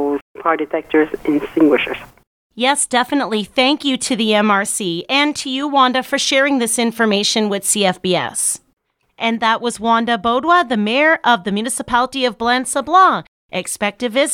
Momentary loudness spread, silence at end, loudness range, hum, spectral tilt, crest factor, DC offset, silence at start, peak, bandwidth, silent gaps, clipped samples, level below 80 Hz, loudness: 7 LU; 0 s; 2 LU; none; -2.5 dB/octave; 16 dB; under 0.1%; 0 s; 0 dBFS; 17 kHz; 0.22-0.35 s, 2.27-2.50 s, 8.73-8.77 s, 13.28-13.49 s; under 0.1%; -54 dBFS; -16 LUFS